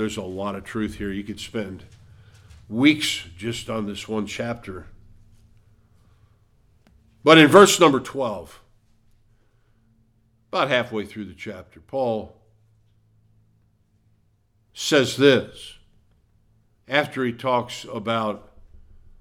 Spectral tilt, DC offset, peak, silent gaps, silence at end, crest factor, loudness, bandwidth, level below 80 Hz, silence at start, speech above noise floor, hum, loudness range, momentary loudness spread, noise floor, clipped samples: -4 dB/octave; under 0.1%; 0 dBFS; none; 0.45 s; 24 dB; -21 LUFS; 17.5 kHz; -54 dBFS; 0 s; 42 dB; none; 15 LU; 22 LU; -63 dBFS; under 0.1%